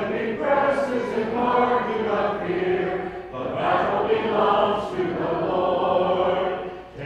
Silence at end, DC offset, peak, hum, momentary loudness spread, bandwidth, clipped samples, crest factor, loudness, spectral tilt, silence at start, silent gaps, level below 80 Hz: 0 s; under 0.1%; -8 dBFS; none; 7 LU; 10 kHz; under 0.1%; 16 dB; -23 LUFS; -6.5 dB/octave; 0 s; none; -52 dBFS